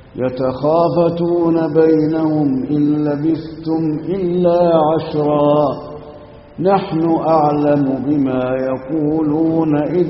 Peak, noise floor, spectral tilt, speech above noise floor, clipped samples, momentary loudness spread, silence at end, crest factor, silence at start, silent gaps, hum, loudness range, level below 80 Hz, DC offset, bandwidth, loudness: -2 dBFS; -37 dBFS; -8 dB/octave; 22 dB; under 0.1%; 7 LU; 0 s; 14 dB; 0 s; none; none; 1 LU; -46 dBFS; under 0.1%; 5.8 kHz; -16 LUFS